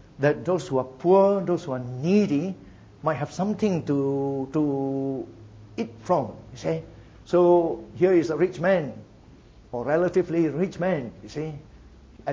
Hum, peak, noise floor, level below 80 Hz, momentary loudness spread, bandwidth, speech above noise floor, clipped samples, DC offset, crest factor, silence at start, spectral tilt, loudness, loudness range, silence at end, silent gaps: none; -6 dBFS; -50 dBFS; -56 dBFS; 15 LU; 7.8 kHz; 26 dB; under 0.1%; under 0.1%; 18 dB; 0.2 s; -7.5 dB/octave; -25 LUFS; 4 LU; 0 s; none